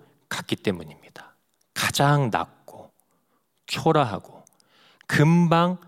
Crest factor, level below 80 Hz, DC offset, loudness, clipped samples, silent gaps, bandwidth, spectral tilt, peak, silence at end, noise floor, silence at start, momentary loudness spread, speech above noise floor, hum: 20 dB; -64 dBFS; under 0.1%; -23 LUFS; under 0.1%; none; 15.5 kHz; -5.5 dB/octave; -4 dBFS; 0.1 s; -70 dBFS; 0.3 s; 17 LU; 49 dB; none